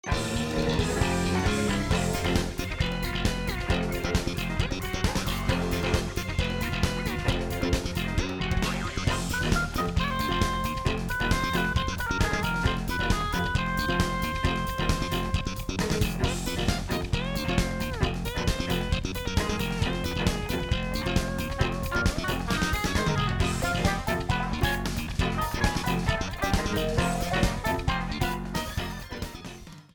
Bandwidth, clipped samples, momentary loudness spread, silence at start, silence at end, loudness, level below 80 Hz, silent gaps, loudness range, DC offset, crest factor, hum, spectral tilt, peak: 19.5 kHz; under 0.1%; 4 LU; 0.05 s; 0.1 s; -28 LUFS; -34 dBFS; none; 2 LU; under 0.1%; 22 dB; none; -5 dB/octave; -6 dBFS